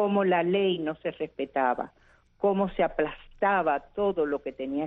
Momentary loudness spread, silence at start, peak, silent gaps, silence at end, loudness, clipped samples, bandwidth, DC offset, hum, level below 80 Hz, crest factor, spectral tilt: 9 LU; 0 s; -12 dBFS; none; 0 s; -28 LUFS; under 0.1%; 4 kHz; under 0.1%; none; -56 dBFS; 16 dB; -9 dB/octave